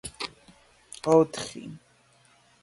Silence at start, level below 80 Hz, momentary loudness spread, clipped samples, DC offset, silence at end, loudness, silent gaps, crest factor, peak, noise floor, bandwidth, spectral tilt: 0.05 s; -62 dBFS; 22 LU; under 0.1%; under 0.1%; 0.85 s; -26 LUFS; none; 22 dB; -6 dBFS; -61 dBFS; 11.5 kHz; -5 dB/octave